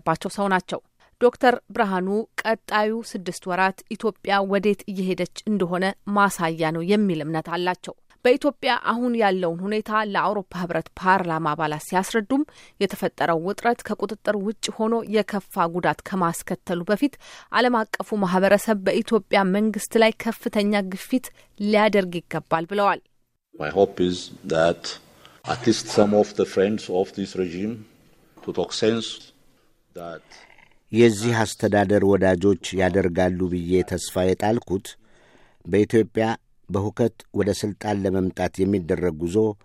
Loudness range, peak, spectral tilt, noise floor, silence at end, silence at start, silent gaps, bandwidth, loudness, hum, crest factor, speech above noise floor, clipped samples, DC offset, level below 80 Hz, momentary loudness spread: 4 LU; -2 dBFS; -5.5 dB/octave; -59 dBFS; 0.1 s; 0.05 s; none; 15.5 kHz; -23 LUFS; none; 20 dB; 36 dB; under 0.1%; under 0.1%; -56 dBFS; 10 LU